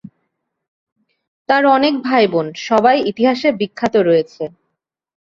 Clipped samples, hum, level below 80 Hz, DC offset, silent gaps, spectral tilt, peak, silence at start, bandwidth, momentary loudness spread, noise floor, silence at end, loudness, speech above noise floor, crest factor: under 0.1%; none; -60 dBFS; under 0.1%; none; -5.5 dB/octave; -2 dBFS; 1.5 s; 7.6 kHz; 8 LU; -75 dBFS; 0.85 s; -15 LUFS; 61 dB; 16 dB